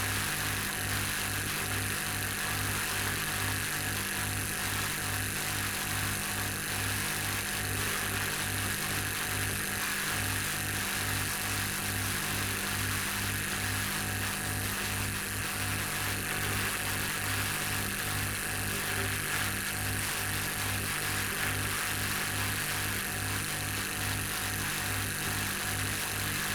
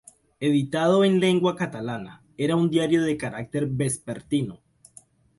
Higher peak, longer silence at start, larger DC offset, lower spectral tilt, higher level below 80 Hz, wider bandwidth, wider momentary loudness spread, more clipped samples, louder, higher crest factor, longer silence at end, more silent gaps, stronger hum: second, -18 dBFS vs -8 dBFS; second, 0 s vs 0.4 s; neither; second, -2.5 dB/octave vs -6 dB/octave; first, -48 dBFS vs -60 dBFS; first, over 20 kHz vs 11.5 kHz; second, 1 LU vs 12 LU; neither; second, -31 LUFS vs -24 LUFS; about the same, 14 dB vs 16 dB; second, 0 s vs 0.85 s; neither; first, 50 Hz at -45 dBFS vs none